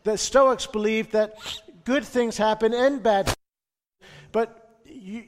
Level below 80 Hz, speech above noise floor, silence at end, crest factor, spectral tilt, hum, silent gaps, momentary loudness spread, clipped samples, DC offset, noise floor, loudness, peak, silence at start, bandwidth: -48 dBFS; over 68 dB; 0.05 s; 18 dB; -3.5 dB/octave; none; none; 14 LU; under 0.1%; under 0.1%; under -90 dBFS; -23 LUFS; -6 dBFS; 0.05 s; 16 kHz